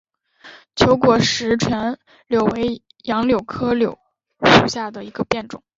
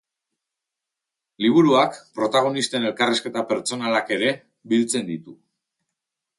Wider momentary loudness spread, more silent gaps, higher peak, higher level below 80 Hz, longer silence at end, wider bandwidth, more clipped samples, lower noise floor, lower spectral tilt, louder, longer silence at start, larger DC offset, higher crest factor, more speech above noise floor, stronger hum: first, 14 LU vs 9 LU; neither; first, 0 dBFS vs -6 dBFS; first, -46 dBFS vs -70 dBFS; second, 0.2 s vs 1.05 s; second, 7.8 kHz vs 11.5 kHz; neither; second, -46 dBFS vs -85 dBFS; about the same, -5 dB/octave vs -4 dB/octave; first, -18 LUFS vs -21 LUFS; second, 0.45 s vs 1.4 s; neither; about the same, 18 dB vs 18 dB; second, 26 dB vs 64 dB; neither